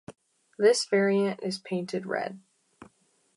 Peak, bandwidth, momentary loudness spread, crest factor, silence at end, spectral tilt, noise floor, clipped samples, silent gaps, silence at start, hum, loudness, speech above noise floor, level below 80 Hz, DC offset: -10 dBFS; 11.5 kHz; 10 LU; 18 dB; 0.55 s; -4.5 dB/octave; -64 dBFS; under 0.1%; none; 0.1 s; none; -27 LUFS; 38 dB; -78 dBFS; under 0.1%